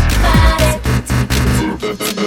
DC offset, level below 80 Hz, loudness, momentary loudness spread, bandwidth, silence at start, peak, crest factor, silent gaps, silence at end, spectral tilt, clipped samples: under 0.1%; -18 dBFS; -14 LUFS; 7 LU; 18.5 kHz; 0 s; 0 dBFS; 12 dB; none; 0 s; -5 dB/octave; under 0.1%